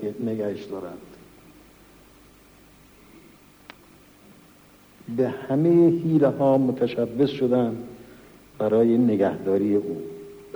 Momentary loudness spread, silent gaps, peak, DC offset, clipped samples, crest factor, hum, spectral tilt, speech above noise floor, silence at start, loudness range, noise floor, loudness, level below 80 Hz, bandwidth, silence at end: 17 LU; none; -8 dBFS; under 0.1%; under 0.1%; 16 dB; none; -8.5 dB/octave; 31 dB; 0 s; 14 LU; -53 dBFS; -22 LUFS; -62 dBFS; over 20 kHz; 0 s